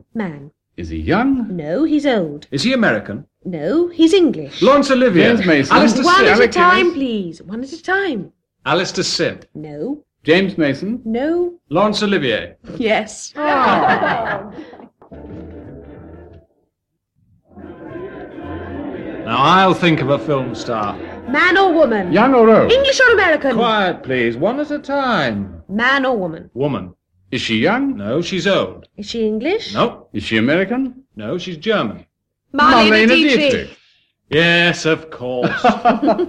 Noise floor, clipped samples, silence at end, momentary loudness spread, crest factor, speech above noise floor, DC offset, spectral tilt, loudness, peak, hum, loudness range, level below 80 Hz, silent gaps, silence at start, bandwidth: -73 dBFS; under 0.1%; 0 s; 17 LU; 16 dB; 58 dB; under 0.1%; -5 dB/octave; -15 LUFS; 0 dBFS; none; 7 LU; -46 dBFS; none; 0.15 s; 11 kHz